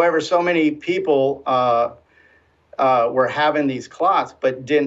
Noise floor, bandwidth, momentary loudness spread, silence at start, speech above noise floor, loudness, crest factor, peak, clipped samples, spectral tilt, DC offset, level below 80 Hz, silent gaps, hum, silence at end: -56 dBFS; 8 kHz; 6 LU; 0 s; 38 dB; -19 LUFS; 14 dB; -6 dBFS; under 0.1%; -5.5 dB/octave; under 0.1%; -64 dBFS; none; none; 0 s